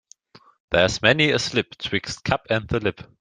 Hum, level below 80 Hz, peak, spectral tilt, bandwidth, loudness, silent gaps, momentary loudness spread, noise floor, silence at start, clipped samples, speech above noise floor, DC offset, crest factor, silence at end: none; -48 dBFS; -2 dBFS; -4 dB/octave; 10 kHz; -22 LUFS; none; 9 LU; -52 dBFS; 0.7 s; under 0.1%; 30 dB; under 0.1%; 22 dB; 0.15 s